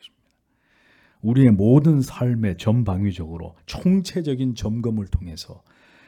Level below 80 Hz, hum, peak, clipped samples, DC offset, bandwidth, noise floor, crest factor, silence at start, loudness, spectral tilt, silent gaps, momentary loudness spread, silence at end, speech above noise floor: -42 dBFS; none; -4 dBFS; under 0.1%; under 0.1%; 13 kHz; -67 dBFS; 18 dB; 0.05 s; -20 LUFS; -8 dB/octave; none; 19 LU; 0.55 s; 47 dB